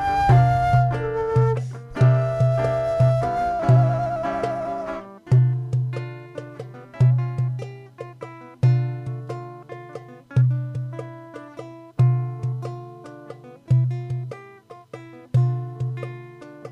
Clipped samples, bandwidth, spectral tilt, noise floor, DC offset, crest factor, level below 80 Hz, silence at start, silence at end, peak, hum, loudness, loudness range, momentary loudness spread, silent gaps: under 0.1%; 6.2 kHz; -9 dB/octave; -45 dBFS; under 0.1%; 16 dB; -44 dBFS; 0 s; 0 s; -8 dBFS; none; -22 LUFS; 6 LU; 21 LU; none